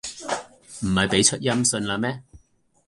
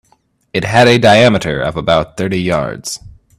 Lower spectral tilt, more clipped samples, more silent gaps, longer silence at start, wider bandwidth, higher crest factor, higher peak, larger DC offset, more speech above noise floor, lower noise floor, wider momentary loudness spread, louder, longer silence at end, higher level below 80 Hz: second, -3 dB/octave vs -5 dB/octave; neither; neither; second, 0.05 s vs 0.55 s; second, 11.5 kHz vs 14 kHz; first, 20 dB vs 14 dB; second, -4 dBFS vs 0 dBFS; neither; second, 39 dB vs 45 dB; first, -61 dBFS vs -57 dBFS; about the same, 13 LU vs 15 LU; second, -22 LUFS vs -12 LUFS; first, 0.5 s vs 0.3 s; second, -48 dBFS vs -40 dBFS